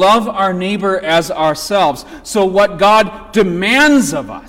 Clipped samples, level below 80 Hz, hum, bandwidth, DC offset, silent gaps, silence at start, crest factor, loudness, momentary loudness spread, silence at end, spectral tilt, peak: under 0.1%; -42 dBFS; none; 17 kHz; under 0.1%; none; 0 s; 12 dB; -13 LUFS; 7 LU; 0 s; -4 dB/octave; -2 dBFS